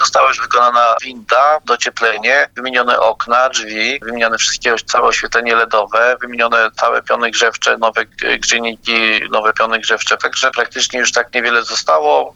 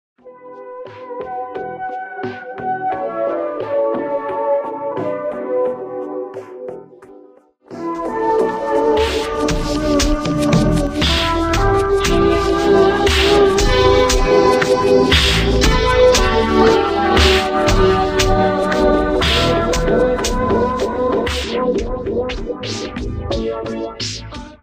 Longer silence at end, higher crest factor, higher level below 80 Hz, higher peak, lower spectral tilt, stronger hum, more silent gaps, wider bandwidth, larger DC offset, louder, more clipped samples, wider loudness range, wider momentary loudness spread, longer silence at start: about the same, 0.05 s vs 0.1 s; about the same, 14 dB vs 16 dB; second, -50 dBFS vs -26 dBFS; about the same, 0 dBFS vs 0 dBFS; second, 0 dB/octave vs -4.5 dB/octave; neither; neither; second, 12 kHz vs 15.5 kHz; neither; first, -13 LUFS vs -16 LUFS; neither; second, 1 LU vs 10 LU; second, 4 LU vs 14 LU; second, 0 s vs 0.25 s